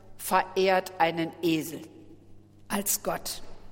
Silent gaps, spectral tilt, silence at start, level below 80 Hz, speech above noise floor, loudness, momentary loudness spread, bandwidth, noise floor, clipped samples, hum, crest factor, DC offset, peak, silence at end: none; -3.5 dB/octave; 0.05 s; -54 dBFS; 23 dB; -28 LUFS; 14 LU; 17 kHz; -51 dBFS; under 0.1%; none; 20 dB; under 0.1%; -8 dBFS; 0 s